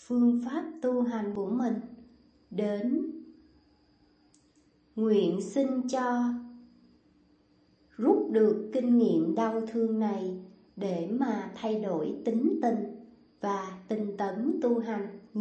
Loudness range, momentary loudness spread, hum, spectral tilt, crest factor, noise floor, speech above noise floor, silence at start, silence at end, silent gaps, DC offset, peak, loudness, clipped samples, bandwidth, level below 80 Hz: 6 LU; 12 LU; none; -7 dB/octave; 18 dB; -65 dBFS; 37 dB; 0.1 s; 0 s; none; under 0.1%; -12 dBFS; -30 LUFS; under 0.1%; 8.6 kHz; -74 dBFS